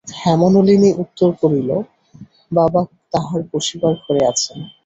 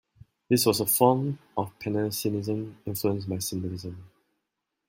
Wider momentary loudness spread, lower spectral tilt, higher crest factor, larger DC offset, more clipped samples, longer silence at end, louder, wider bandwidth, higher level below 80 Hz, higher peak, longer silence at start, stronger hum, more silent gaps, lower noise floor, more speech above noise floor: second, 10 LU vs 13 LU; about the same, -6 dB/octave vs -5 dB/octave; second, 14 dB vs 22 dB; neither; neither; second, 0.15 s vs 0.8 s; first, -16 LUFS vs -27 LUFS; second, 8.2 kHz vs 16.5 kHz; first, -52 dBFS vs -64 dBFS; first, -2 dBFS vs -6 dBFS; second, 0.05 s vs 0.5 s; neither; neither; second, -43 dBFS vs -83 dBFS; second, 27 dB vs 56 dB